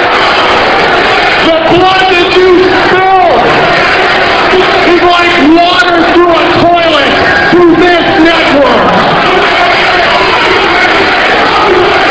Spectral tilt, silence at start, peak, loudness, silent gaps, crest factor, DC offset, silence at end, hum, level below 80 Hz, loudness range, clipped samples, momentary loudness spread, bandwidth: -4.5 dB/octave; 0 s; 0 dBFS; -5 LUFS; none; 6 dB; under 0.1%; 0 s; none; -32 dBFS; 1 LU; 6%; 1 LU; 8 kHz